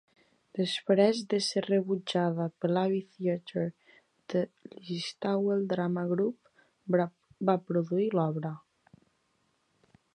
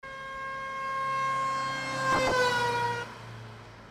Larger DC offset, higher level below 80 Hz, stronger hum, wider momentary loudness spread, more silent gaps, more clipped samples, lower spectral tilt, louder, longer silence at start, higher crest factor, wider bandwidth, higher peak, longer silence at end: neither; second, -78 dBFS vs -56 dBFS; neither; second, 10 LU vs 18 LU; neither; neither; first, -6 dB/octave vs -3.5 dB/octave; about the same, -30 LUFS vs -29 LUFS; first, 0.55 s vs 0.05 s; first, 20 dB vs 14 dB; second, 11.5 kHz vs 16 kHz; first, -10 dBFS vs -16 dBFS; first, 1.55 s vs 0 s